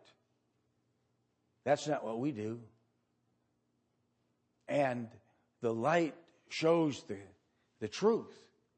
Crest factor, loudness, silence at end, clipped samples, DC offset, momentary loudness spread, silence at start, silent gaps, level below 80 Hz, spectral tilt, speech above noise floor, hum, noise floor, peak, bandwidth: 20 dB; -35 LUFS; 0.45 s; under 0.1%; under 0.1%; 15 LU; 1.65 s; none; -84 dBFS; -5.5 dB/octave; 45 dB; none; -79 dBFS; -16 dBFS; 8.4 kHz